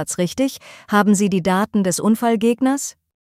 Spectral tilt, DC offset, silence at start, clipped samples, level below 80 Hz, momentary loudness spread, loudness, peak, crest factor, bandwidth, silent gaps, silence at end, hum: -5 dB/octave; under 0.1%; 0 s; under 0.1%; -56 dBFS; 7 LU; -18 LUFS; -4 dBFS; 14 dB; 16 kHz; none; 0.4 s; none